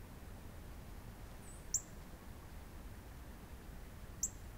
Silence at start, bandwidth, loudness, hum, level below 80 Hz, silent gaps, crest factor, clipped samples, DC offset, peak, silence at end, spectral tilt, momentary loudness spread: 0 s; 16 kHz; -48 LUFS; none; -54 dBFS; none; 24 dB; under 0.1%; under 0.1%; -24 dBFS; 0 s; -3 dB/octave; 14 LU